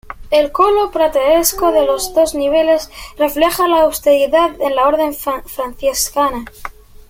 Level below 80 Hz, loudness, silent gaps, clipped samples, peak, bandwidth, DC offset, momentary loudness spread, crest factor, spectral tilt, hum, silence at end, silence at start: -38 dBFS; -14 LUFS; none; under 0.1%; 0 dBFS; 16.5 kHz; under 0.1%; 10 LU; 14 dB; -2.5 dB/octave; none; 0.4 s; 0.05 s